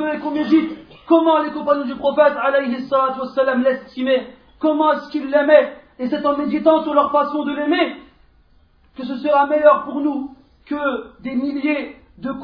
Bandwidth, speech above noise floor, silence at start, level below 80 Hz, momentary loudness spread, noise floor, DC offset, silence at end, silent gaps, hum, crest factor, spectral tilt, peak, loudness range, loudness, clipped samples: 5.4 kHz; 36 dB; 0 s; -56 dBFS; 14 LU; -54 dBFS; under 0.1%; 0 s; none; none; 18 dB; -7.5 dB/octave; 0 dBFS; 3 LU; -18 LUFS; under 0.1%